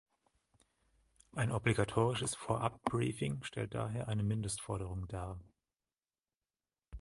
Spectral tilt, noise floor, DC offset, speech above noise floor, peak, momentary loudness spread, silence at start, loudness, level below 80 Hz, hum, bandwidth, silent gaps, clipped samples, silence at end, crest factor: -5.5 dB/octave; under -90 dBFS; under 0.1%; over 54 dB; -16 dBFS; 11 LU; 1.35 s; -37 LUFS; -56 dBFS; none; 11.5 kHz; none; under 0.1%; 0 s; 22 dB